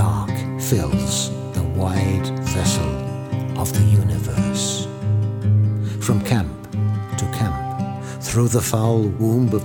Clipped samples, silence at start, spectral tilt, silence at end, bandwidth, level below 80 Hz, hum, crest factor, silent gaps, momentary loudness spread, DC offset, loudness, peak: under 0.1%; 0 s; -5.5 dB/octave; 0 s; 19.5 kHz; -38 dBFS; none; 18 dB; none; 7 LU; under 0.1%; -21 LUFS; -2 dBFS